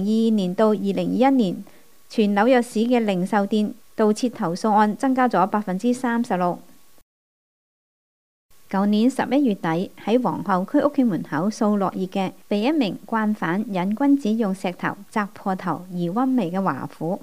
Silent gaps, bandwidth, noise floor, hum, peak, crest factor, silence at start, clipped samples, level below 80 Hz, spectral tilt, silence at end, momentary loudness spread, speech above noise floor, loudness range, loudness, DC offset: 7.02-8.49 s; 15.5 kHz; under -90 dBFS; none; -4 dBFS; 18 dB; 0 s; under 0.1%; -68 dBFS; -6.5 dB/octave; 0.05 s; 8 LU; over 69 dB; 5 LU; -22 LUFS; 0.4%